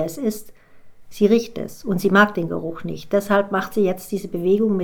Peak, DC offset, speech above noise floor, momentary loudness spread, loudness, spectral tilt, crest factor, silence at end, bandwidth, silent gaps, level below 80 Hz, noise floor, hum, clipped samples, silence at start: -2 dBFS; under 0.1%; 22 dB; 13 LU; -21 LUFS; -6 dB/octave; 18 dB; 0 s; 19.5 kHz; none; -54 dBFS; -42 dBFS; none; under 0.1%; 0 s